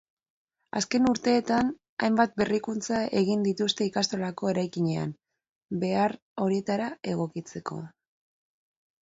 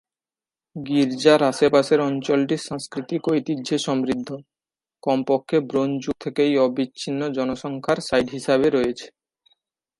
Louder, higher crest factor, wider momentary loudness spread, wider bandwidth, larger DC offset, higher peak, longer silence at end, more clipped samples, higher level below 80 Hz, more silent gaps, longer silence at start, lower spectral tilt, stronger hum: second, -28 LUFS vs -22 LUFS; about the same, 20 dB vs 20 dB; about the same, 12 LU vs 11 LU; second, 8 kHz vs 11.5 kHz; neither; second, -8 dBFS vs -2 dBFS; first, 1.15 s vs 0.95 s; neither; about the same, -64 dBFS vs -60 dBFS; first, 1.89-1.97 s, 5.49-5.61 s, 6.22-6.36 s vs none; about the same, 0.75 s vs 0.75 s; about the same, -5 dB/octave vs -5.5 dB/octave; neither